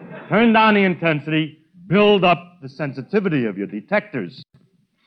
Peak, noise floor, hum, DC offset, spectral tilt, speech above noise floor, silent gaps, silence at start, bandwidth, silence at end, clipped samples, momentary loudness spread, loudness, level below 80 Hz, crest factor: -4 dBFS; -59 dBFS; none; under 0.1%; -8.5 dB/octave; 41 dB; none; 0 s; 6 kHz; 0.65 s; under 0.1%; 16 LU; -18 LUFS; -60 dBFS; 16 dB